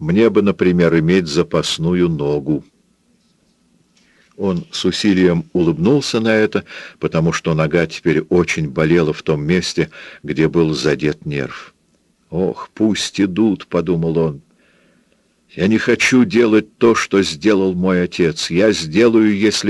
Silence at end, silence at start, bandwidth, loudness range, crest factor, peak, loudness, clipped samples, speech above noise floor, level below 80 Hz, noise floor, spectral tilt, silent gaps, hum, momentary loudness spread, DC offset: 0 s; 0 s; 12 kHz; 5 LU; 16 dB; 0 dBFS; -16 LUFS; under 0.1%; 44 dB; -46 dBFS; -59 dBFS; -5.5 dB/octave; none; none; 9 LU; under 0.1%